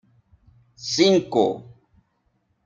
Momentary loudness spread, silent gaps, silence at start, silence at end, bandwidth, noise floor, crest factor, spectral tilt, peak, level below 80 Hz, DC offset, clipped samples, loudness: 17 LU; none; 0.8 s; 1.05 s; 7.8 kHz; -69 dBFS; 20 dB; -4.5 dB/octave; -6 dBFS; -64 dBFS; under 0.1%; under 0.1%; -20 LUFS